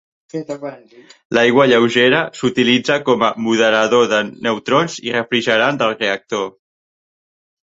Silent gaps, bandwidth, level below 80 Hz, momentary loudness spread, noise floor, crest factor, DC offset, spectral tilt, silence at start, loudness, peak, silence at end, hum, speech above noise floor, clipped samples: 1.25-1.30 s; 8 kHz; -60 dBFS; 15 LU; under -90 dBFS; 16 dB; under 0.1%; -4.5 dB/octave; 0.35 s; -15 LUFS; 0 dBFS; 1.25 s; none; over 74 dB; under 0.1%